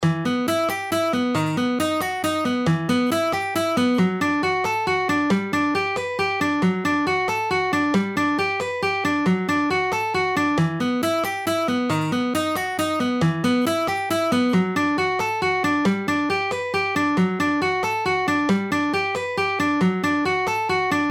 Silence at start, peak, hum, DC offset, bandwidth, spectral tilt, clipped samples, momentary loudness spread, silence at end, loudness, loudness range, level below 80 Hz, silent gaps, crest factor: 0 s; -8 dBFS; none; under 0.1%; 18.5 kHz; -5.5 dB/octave; under 0.1%; 3 LU; 0 s; -21 LUFS; 1 LU; -58 dBFS; none; 14 dB